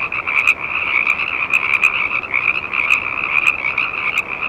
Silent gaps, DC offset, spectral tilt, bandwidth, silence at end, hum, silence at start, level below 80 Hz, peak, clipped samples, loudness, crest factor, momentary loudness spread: none; under 0.1%; -2 dB/octave; over 20 kHz; 0 s; none; 0 s; -50 dBFS; 0 dBFS; under 0.1%; -15 LUFS; 18 dB; 4 LU